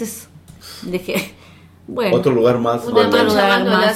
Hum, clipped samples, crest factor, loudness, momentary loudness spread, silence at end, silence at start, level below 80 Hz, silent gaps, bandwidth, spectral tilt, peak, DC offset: none; under 0.1%; 16 dB; -16 LUFS; 19 LU; 0 s; 0 s; -52 dBFS; none; 16.5 kHz; -5 dB/octave; 0 dBFS; under 0.1%